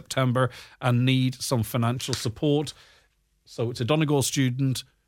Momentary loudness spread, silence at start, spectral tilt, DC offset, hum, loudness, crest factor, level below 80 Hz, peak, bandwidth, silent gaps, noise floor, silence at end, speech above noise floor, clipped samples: 7 LU; 0.1 s; -5.5 dB/octave; under 0.1%; none; -25 LUFS; 18 dB; -58 dBFS; -8 dBFS; 16.5 kHz; none; -65 dBFS; 0.25 s; 40 dB; under 0.1%